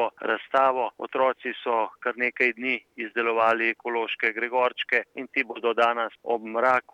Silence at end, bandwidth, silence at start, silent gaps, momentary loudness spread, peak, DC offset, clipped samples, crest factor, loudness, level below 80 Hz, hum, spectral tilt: 0.15 s; 9.6 kHz; 0 s; none; 7 LU; -8 dBFS; under 0.1%; under 0.1%; 18 dB; -25 LUFS; -82 dBFS; none; -4.5 dB/octave